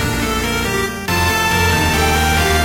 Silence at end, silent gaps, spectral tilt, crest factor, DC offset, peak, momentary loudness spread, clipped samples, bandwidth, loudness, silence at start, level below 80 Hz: 0 s; none; -3.5 dB/octave; 14 dB; under 0.1%; -2 dBFS; 4 LU; under 0.1%; 16 kHz; -15 LUFS; 0 s; -26 dBFS